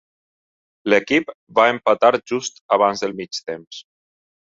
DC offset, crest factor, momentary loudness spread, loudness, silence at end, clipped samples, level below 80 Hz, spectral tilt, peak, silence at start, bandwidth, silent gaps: under 0.1%; 20 dB; 15 LU; -19 LUFS; 0.8 s; under 0.1%; -64 dBFS; -3.5 dB/octave; 0 dBFS; 0.85 s; 7.8 kHz; 1.34-1.47 s, 2.61-2.69 s